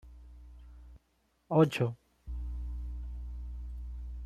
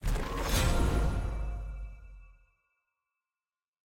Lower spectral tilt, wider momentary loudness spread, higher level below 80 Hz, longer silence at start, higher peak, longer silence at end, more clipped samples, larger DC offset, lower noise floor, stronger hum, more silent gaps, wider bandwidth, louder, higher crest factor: first, -7.5 dB/octave vs -5 dB/octave; first, 27 LU vs 17 LU; second, -42 dBFS vs -34 dBFS; about the same, 0.05 s vs 0 s; first, -12 dBFS vs -16 dBFS; second, 0 s vs 1.55 s; neither; neither; second, -73 dBFS vs under -90 dBFS; neither; neither; second, 13.5 kHz vs 16.5 kHz; about the same, -34 LUFS vs -32 LUFS; first, 22 dB vs 16 dB